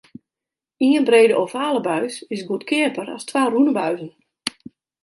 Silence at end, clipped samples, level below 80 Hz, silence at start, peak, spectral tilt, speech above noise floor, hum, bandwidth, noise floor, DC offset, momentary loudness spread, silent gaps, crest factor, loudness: 0.55 s; under 0.1%; -72 dBFS; 0.8 s; -2 dBFS; -4.5 dB/octave; 69 dB; none; 11.5 kHz; -88 dBFS; under 0.1%; 15 LU; none; 20 dB; -20 LUFS